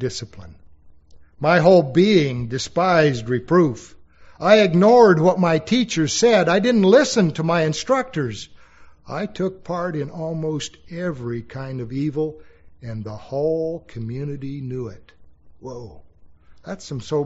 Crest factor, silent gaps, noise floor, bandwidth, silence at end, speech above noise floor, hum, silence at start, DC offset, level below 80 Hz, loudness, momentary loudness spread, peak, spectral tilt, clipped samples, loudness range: 20 dB; none; -46 dBFS; 8 kHz; 0 s; 27 dB; none; 0 s; under 0.1%; -52 dBFS; -19 LUFS; 19 LU; 0 dBFS; -5 dB/octave; under 0.1%; 13 LU